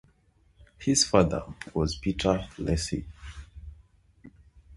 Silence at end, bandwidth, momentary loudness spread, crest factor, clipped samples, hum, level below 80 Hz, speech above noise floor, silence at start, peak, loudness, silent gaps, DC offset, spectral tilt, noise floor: 0 s; 11.5 kHz; 23 LU; 26 dB; under 0.1%; none; -42 dBFS; 37 dB; 0.8 s; -4 dBFS; -27 LUFS; none; under 0.1%; -4.5 dB/octave; -64 dBFS